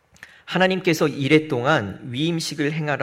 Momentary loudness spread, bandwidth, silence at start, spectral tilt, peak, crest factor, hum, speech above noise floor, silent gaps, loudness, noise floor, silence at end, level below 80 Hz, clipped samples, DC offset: 7 LU; 16 kHz; 0.2 s; -5.5 dB/octave; -4 dBFS; 18 dB; none; 25 dB; none; -21 LUFS; -45 dBFS; 0 s; -60 dBFS; under 0.1%; under 0.1%